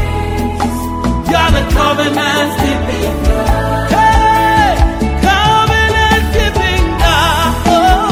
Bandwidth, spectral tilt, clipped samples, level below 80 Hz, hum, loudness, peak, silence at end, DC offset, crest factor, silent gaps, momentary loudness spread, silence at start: 16.5 kHz; -5 dB/octave; under 0.1%; -18 dBFS; none; -12 LUFS; 0 dBFS; 0 s; under 0.1%; 12 dB; none; 7 LU; 0 s